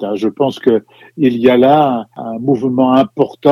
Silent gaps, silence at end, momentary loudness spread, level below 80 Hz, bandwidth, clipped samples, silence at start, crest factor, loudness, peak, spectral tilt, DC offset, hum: none; 0 s; 9 LU; -58 dBFS; 13 kHz; 0.2%; 0 s; 12 dB; -13 LUFS; 0 dBFS; -8 dB/octave; under 0.1%; none